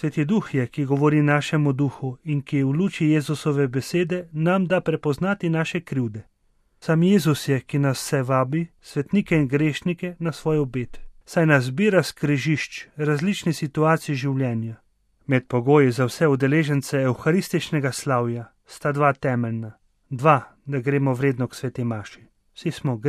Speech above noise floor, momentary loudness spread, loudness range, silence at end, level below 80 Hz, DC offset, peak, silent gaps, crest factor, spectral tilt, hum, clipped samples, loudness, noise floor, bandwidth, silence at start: 42 dB; 10 LU; 3 LU; 0 s; -54 dBFS; under 0.1%; -4 dBFS; none; 20 dB; -6.5 dB/octave; none; under 0.1%; -22 LUFS; -64 dBFS; 14.5 kHz; 0 s